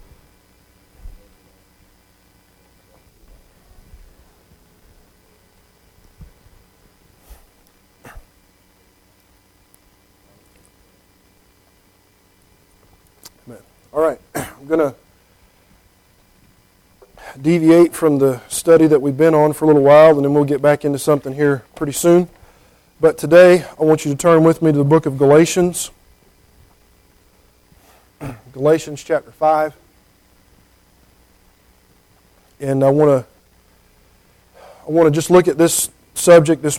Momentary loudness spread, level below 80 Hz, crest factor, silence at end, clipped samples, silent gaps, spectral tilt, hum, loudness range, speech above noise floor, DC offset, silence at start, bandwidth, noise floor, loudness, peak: 13 LU; -50 dBFS; 18 dB; 0 s; under 0.1%; none; -6 dB/octave; none; 12 LU; 42 dB; under 0.1%; 1.05 s; 16.5 kHz; -55 dBFS; -14 LUFS; 0 dBFS